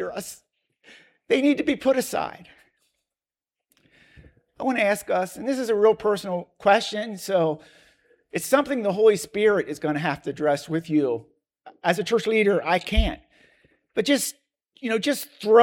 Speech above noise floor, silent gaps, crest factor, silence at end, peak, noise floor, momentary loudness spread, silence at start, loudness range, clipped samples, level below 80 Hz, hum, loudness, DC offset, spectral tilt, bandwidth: over 68 dB; none; 20 dB; 0 s; -4 dBFS; under -90 dBFS; 11 LU; 0 s; 5 LU; under 0.1%; -40 dBFS; none; -23 LUFS; under 0.1%; -4.5 dB/octave; 17.5 kHz